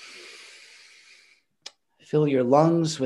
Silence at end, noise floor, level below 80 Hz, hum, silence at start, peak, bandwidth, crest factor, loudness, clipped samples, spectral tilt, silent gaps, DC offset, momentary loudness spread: 0 s; -60 dBFS; -72 dBFS; none; 0.05 s; -6 dBFS; 11.5 kHz; 20 dB; -21 LUFS; under 0.1%; -6.5 dB/octave; none; under 0.1%; 26 LU